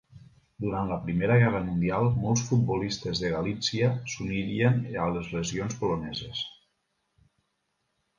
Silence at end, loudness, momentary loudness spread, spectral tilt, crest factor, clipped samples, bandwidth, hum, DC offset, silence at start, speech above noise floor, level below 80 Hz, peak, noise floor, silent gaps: 1.7 s; -28 LUFS; 9 LU; -5.5 dB/octave; 20 dB; under 0.1%; 7.4 kHz; none; under 0.1%; 0.15 s; 50 dB; -50 dBFS; -10 dBFS; -77 dBFS; none